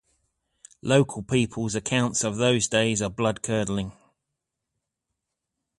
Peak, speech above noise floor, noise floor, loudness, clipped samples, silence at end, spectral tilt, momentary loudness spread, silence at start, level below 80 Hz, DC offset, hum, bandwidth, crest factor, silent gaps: -8 dBFS; 59 dB; -83 dBFS; -24 LUFS; under 0.1%; 1.85 s; -4.5 dB/octave; 7 LU; 0.85 s; -54 dBFS; under 0.1%; none; 11.5 kHz; 20 dB; none